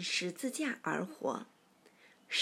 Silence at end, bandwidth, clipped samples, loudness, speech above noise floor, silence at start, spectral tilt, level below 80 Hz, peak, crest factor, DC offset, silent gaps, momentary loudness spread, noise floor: 0 s; 16 kHz; under 0.1%; -37 LUFS; 28 dB; 0 s; -3 dB/octave; under -90 dBFS; -18 dBFS; 20 dB; under 0.1%; none; 7 LU; -65 dBFS